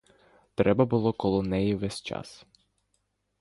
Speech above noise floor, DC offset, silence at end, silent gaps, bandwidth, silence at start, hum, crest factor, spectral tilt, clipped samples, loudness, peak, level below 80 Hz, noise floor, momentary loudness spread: 49 dB; under 0.1%; 1.05 s; none; 11.5 kHz; 0.6 s; 50 Hz at -45 dBFS; 22 dB; -7 dB/octave; under 0.1%; -27 LUFS; -8 dBFS; -52 dBFS; -76 dBFS; 15 LU